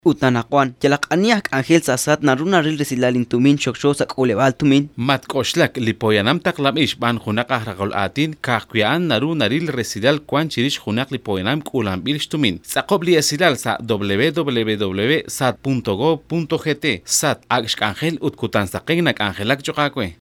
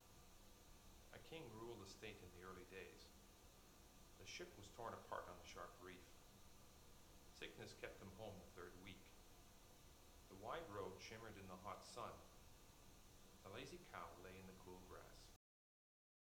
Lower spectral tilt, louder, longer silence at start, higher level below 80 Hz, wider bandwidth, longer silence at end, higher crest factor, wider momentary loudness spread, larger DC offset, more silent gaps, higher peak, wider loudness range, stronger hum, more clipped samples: about the same, -4.5 dB/octave vs -4 dB/octave; first, -18 LUFS vs -59 LUFS; about the same, 0.05 s vs 0 s; first, -54 dBFS vs -70 dBFS; about the same, 18 kHz vs 19.5 kHz; second, 0.05 s vs 1 s; second, 18 dB vs 24 dB; second, 5 LU vs 13 LU; neither; neither; first, 0 dBFS vs -36 dBFS; about the same, 3 LU vs 3 LU; neither; neither